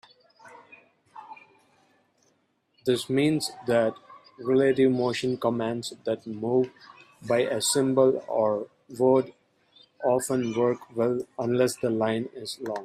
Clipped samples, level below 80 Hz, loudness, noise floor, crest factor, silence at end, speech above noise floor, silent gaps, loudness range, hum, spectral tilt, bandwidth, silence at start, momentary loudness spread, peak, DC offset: under 0.1%; -70 dBFS; -26 LUFS; -70 dBFS; 18 dB; 0 s; 45 dB; none; 4 LU; none; -5 dB/octave; 14.5 kHz; 0.45 s; 10 LU; -10 dBFS; under 0.1%